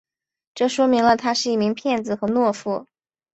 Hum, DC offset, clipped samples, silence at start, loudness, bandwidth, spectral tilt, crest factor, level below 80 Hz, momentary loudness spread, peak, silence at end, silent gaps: none; under 0.1%; under 0.1%; 0.55 s; -21 LUFS; 8.2 kHz; -4.5 dB/octave; 18 dB; -60 dBFS; 9 LU; -4 dBFS; 0.5 s; none